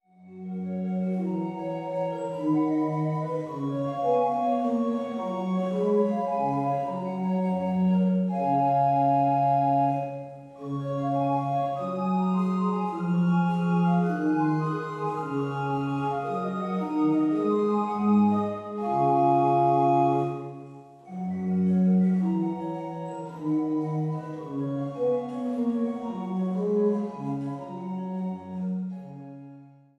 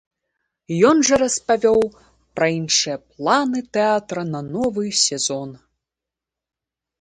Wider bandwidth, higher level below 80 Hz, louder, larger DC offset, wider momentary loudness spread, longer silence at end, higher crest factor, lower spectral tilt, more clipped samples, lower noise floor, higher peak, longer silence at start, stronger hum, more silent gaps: second, 8 kHz vs 11 kHz; second, -70 dBFS vs -56 dBFS; second, -26 LUFS vs -19 LUFS; neither; about the same, 12 LU vs 11 LU; second, 0.3 s vs 1.45 s; about the same, 16 dB vs 18 dB; first, -9.5 dB/octave vs -3 dB/octave; neither; second, -49 dBFS vs -87 dBFS; second, -10 dBFS vs -2 dBFS; second, 0.2 s vs 0.7 s; neither; neither